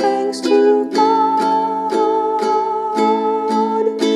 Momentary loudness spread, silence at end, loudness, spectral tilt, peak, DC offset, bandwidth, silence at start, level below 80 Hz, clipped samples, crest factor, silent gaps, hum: 4 LU; 0 s; -16 LUFS; -4.5 dB/octave; -2 dBFS; under 0.1%; 12 kHz; 0 s; -70 dBFS; under 0.1%; 14 dB; none; none